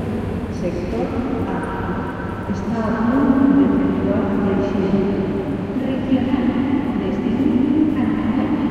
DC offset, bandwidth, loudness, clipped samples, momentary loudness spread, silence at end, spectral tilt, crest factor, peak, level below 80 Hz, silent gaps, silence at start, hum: under 0.1%; 9.6 kHz; -19 LUFS; under 0.1%; 8 LU; 0 s; -8.5 dB/octave; 16 dB; -4 dBFS; -38 dBFS; none; 0 s; none